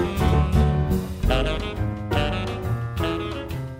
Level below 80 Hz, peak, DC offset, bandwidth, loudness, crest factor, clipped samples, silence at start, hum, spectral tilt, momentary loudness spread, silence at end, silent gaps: -28 dBFS; -8 dBFS; under 0.1%; 16 kHz; -24 LUFS; 16 dB; under 0.1%; 0 s; none; -7 dB/octave; 8 LU; 0 s; none